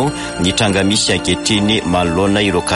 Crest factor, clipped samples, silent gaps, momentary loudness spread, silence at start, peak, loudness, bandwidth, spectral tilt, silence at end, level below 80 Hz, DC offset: 14 dB; under 0.1%; none; 3 LU; 0 s; 0 dBFS; -14 LUFS; 11.5 kHz; -4 dB/octave; 0 s; -36 dBFS; under 0.1%